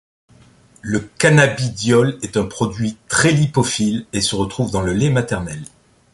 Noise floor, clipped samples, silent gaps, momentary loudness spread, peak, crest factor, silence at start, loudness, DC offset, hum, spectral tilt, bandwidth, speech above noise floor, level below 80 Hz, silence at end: -49 dBFS; under 0.1%; none; 10 LU; -2 dBFS; 16 dB; 0.85 s; -17 LUFS; under 0.1%; none; -5 dB/octave; 11.5 kHz; 32 dB; -42 dBFS; 0.5 s